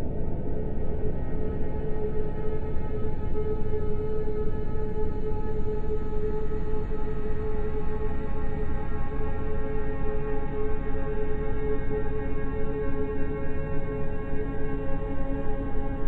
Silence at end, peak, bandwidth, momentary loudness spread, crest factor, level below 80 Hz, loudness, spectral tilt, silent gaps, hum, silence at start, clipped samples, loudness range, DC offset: 0 s; -12 dBFS; 2.9 kHz; 2 LU; 10 dB; -30 dBFS; -32 LUFS; -10.5 dB/octave; none; none; 0 s; under 0.1%; 1 LU; under 0.1%